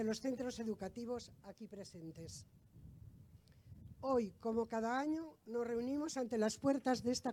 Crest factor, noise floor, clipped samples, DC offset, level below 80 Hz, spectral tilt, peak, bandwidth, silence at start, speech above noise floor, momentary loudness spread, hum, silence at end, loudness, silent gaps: 18 dB; -63 dBFS; under 0.1%; under 0.1%; -70 dBFS; -5 dB/octave; -22 dBFS; 17.5 kHz; 0 s; 22 dB; 21 LU; none; 0 s; -40 LUFS; none